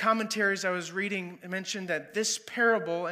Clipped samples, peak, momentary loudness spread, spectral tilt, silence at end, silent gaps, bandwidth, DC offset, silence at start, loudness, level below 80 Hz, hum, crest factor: under 0.1%; -12 dBFS; 9 LU; -3 dB/octave; 0 s; none; 15.5 kHz; under 0.1%; 0 s; -29 LUFS; -86 dBFS; none; 18 dB